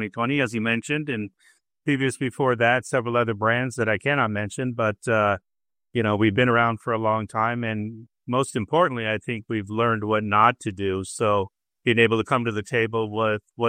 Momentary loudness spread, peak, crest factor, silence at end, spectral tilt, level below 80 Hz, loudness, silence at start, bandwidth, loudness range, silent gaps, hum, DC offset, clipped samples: 9 LU; -4 dBFS; 20 dB; 0 s; -5.5 dB/octave; -62 dBFS; -23 LUFS; 0 s; 14.5 kHz; 2 LU; none; none; under 0.1%; under 0.1%